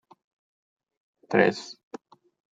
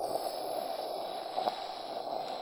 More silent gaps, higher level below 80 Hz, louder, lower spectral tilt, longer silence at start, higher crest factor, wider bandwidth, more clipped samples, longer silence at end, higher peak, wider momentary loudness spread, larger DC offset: neither; second, -80 dBFS vs -74 dBFS; first, -25 LUFS vs -37 LUFS; first, -5.5 dB/octave vs -3 dB/octave; first, 1.3 s vs 0 s; about the same, 26 dB vs 22 dB; second, 9.2 kHz vs over 20 kHz; neither; first, 0.8 s vs 0 s; first, -6 dBFS vs -16 dBFS; first, 23 LU vs 5 LU; neither